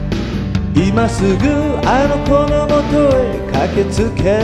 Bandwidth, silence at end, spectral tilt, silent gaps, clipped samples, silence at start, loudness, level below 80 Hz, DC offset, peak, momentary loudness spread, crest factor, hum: 12.5 kHz; 0 s; -7 dB/octave; none; under 0.1%; 0 s; -14 LUFS; -24 dBFS; under 0.1%; 0 dBFS; 5 LU; 14 dB; none